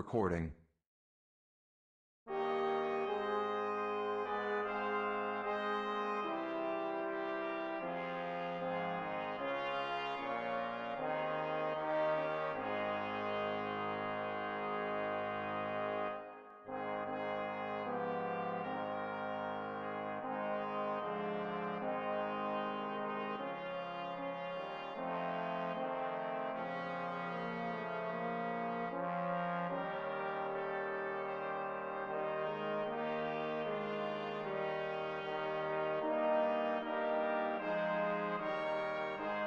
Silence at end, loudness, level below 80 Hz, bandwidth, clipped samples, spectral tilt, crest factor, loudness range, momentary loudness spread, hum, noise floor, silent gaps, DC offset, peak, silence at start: 0 s; -39 LUFS; -70 dBFS; 7.6 kHz; under 0.1%; -7 dB/octave; 16 dB; 4 LU; 5 LU; none; under -90 dBFS; 0.86-2.26 s; under 0.1%; -22 dBFS; 0 s